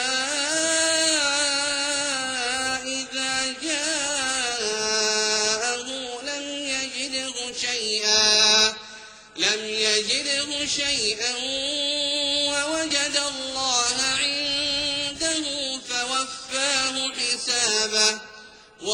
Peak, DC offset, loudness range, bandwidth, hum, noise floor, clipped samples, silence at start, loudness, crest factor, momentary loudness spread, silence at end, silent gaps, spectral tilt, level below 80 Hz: -4 dBFS; under 0.1%; 4 LU; 16 kHz; none; -46 dBFS; under 0.1%; 0 s; -22 LUFS; 20 dB; 8 LU; 0 s; none; 0.5 dB/octave; -58 dBFS